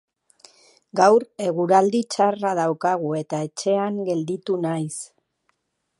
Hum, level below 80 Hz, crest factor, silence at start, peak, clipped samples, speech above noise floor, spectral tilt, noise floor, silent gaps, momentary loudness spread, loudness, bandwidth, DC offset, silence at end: none; -76 dBFS; 20 dB; 0.95 s; -4 dBFS; under 0.1%; 50 dB; -5.5 dB/octave; -71 dBFS; none; 11 LU; -22 LUFS; 11.5 kHz; under 0.1%; 0.95 s